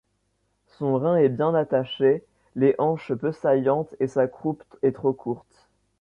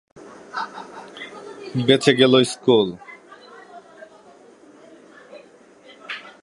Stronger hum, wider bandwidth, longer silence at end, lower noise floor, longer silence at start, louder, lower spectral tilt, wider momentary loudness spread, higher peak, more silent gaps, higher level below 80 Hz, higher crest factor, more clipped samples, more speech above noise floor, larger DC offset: neither; second, 7 kHz vs 11.5 kHz; first, 0.6 s vs 0.2 s; first, -71 dBFS vs -49 dBFS; first, 0.8 s vs 0.25 s; second, -24 LUFS vs -18 LUFS; first, -8.5 dB/octave vs -5 dB/octave; second, 10 LU vs 28 LU; second, -8 dBFS vs 0 dBFS; neither; about the same, -64 dBFS vs -66 dBFS; second, 16 dB vs 22 dB; neither; first, 48 dB vs 31 dB; neither